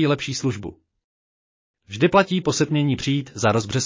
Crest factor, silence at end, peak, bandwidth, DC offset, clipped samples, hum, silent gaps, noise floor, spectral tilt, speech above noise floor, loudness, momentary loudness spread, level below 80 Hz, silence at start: 18 dB; 0 s; -4 dBFS; 7.6 kHz; under 0.1%; under 0.1%; none; 1.04-1.74 s; under -90 dBFS; -5 dB/octave; over 69 dB; -21 LUFS; 12 LU; -52 dBFS; 0 s